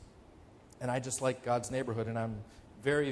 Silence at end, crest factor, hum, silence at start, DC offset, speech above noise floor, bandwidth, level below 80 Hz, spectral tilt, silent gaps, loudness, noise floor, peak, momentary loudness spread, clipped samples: 0 s; 20 dB; none; 0 s; under 0.1%; 23 dB; 11 kHz; -60 dBFS; -5 dB/octave; none; -35 LUFS; -57 dBFS; -16 dBFS; 9 LU; under 0.1%